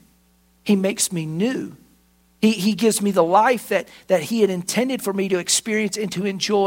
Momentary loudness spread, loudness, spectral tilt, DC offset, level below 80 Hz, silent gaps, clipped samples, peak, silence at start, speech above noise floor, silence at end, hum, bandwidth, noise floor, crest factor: 7 LU; -20 LUFS; -4 dB/octave; under 0.1%; -64 dBFS; none; under 0.1%; -2 dBFS; 0.65 s; 39 dB; 0 s; none; 16.5 kHz; -59 dBFS; 18 dB